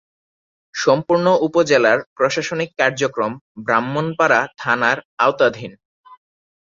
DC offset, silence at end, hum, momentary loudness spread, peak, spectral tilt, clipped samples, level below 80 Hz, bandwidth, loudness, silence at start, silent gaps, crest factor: under 0.1%; 0.5 s; none; 9 LU; -2 dBFS; -4.5 dB/octave; under 0.1%; -62 dBFS; 7.6 kHz; -18 LUFS; 0.75 s; 2.06-2.16 s, 3.41-3.55 s, 5.05-5.18 s, 5.85-6.04 s; 18 dB